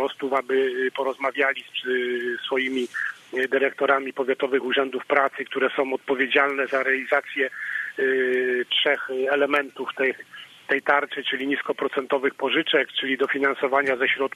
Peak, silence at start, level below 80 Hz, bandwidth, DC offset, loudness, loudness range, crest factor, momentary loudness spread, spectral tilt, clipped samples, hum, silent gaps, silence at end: -6 dBFS; 0 s; -76 dBFS; 13 kHz; under 0.1%; -23 LUFS; 2 LU; 18 dB; 6 LU; -3.5 dB/octave; under 0.1%; none; none; 0.05 s